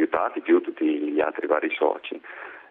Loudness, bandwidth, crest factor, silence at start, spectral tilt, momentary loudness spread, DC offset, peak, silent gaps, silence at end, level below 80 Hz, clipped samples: -24 LUFS; 3.9 kHz; 18 dB; 0 s; -7.5 dB/octave; 15 LU; under 0.1%; -6 dBFS; none; 0.1 s; -70 dBFS; under 0.1%